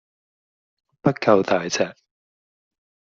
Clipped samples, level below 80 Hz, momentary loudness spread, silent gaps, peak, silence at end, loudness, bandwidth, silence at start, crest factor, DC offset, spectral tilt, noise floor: under 0.1%; -64 dBFS; 7 LU; none; -2 dBFS; 1.25 s; -21 LUFS; 7.6 kHz; 1.05 s; 22 dB; under 0.1%; -4.5 dB/octave; under -90 dBFS